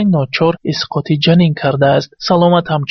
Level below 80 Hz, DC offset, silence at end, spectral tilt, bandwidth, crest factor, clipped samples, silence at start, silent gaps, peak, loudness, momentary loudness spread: -48 dBFS; under 0.1%; 0 s; -5.5 dB/octave; 6.4 kHz; 12 dB; under 0.1%; 0 s; none; 0 dBFS; -13 LUFS; 6 LU